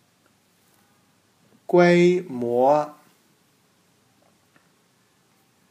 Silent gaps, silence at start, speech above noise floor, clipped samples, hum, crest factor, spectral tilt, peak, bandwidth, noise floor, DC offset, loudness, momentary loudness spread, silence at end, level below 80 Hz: none; 1.7 s; 45 dB; under 0.1%; none; 20 dB; -7 dB/octave; -6 dBFS; 9.8 kHz; -63 dBFS; under 0.1%; -20 LUFS; 14 LU; 2.8 s; -74 dBFS